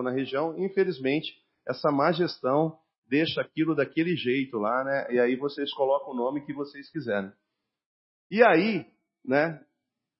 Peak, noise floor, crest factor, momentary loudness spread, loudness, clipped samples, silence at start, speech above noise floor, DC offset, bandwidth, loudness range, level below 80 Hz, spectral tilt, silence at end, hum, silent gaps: -4 dBFS; -82 dBFS; 22 dB; 12 LU; -27 LUFS; under 0.1%; 0 s; 56 dB; under 0.1%; 5.8 kHz; 2 LU; -76 dBFS; -9.5 dB/octave; 0.6 s; none; 2.98-3.02 s, 7.86-8.30 s